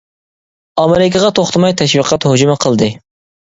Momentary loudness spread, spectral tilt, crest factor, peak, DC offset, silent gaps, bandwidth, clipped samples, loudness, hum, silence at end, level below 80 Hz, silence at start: 5 LU; -5 dB/octave; 12 dB; 0 dBFS; under 0.1%; none; 8 kHz; under 0.1%; -12 LUFS; none; 0.45 s; -46 dBFS; 0.75 s